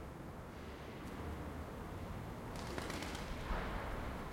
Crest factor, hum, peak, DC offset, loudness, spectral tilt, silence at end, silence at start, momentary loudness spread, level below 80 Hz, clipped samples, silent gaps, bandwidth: 18 dB; none; -26 dBFS; under 0.1%; -46 LUFS; -5.5 dB/octave; 0 s; 0 s; 7 LU; -50 dBFS; under 0.1%; none; 16.5 kHz